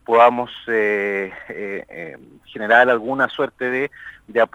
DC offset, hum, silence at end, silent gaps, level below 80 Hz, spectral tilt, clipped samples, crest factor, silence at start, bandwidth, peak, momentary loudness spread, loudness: under 0.1%; none; 0.1 s; none; -62 dBFS; -5.5 dB/octave; under 0.1%; 20 dB; 0.1 s; 10 kHz; 0 dBFS; 20 LU; -19 LUFS